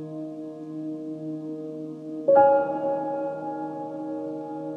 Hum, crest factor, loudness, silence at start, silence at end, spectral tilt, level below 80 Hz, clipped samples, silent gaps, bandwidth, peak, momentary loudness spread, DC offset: none; 20 dB; -27 LUFS; 0 s; 0 s; -9 dB/octave; -78 dBFS; under 0.1%; none; 4.4 kHz; -6 dBFS; 17 LU; under 0.1%